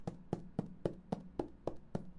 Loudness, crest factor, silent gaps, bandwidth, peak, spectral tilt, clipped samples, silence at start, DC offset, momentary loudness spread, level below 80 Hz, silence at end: -44 LUFS; 24 dB; none; 11 kHz; -20 dBFS; -8.5 dB/octave; under 0.1%; 0 s; under 0.1%; 4 LU; -58 dBFS; 0 s